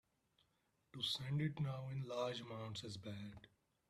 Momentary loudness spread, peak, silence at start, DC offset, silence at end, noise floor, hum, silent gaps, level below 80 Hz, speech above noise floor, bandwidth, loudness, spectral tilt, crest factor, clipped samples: 13 LU; -30 dBFS; 0.95 s; under 0.1%; 0.4 s; -82 dBFS; none; none; -76 dBFS; 38 dB; 14 kHz; -45 LUFS; -5.5 dB/octave; 18 dB; under 0.1%